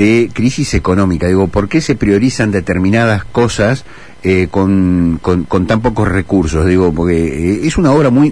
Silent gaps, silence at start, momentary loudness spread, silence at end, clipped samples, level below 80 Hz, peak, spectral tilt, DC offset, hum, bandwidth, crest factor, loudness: none; 0 s; 4 LU; 0 s; under 0.1%; -28 dBFS; 0 dBFS; -6.5 dB/octave; 2%; none; 10.5 kHz; 12 dB; -12 LUFS